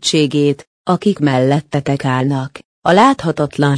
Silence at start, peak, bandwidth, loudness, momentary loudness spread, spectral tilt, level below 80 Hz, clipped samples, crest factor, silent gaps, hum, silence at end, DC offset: 0 s; 0 dBFS; 10.5 kHz; -15 LUFS; 9 LU; -6 dB/octave; -52 dBFS; under 0.1%; 14 dB; 0.67-0.85 s, 2.65-2.82 s; none; 0 s; under 0.1%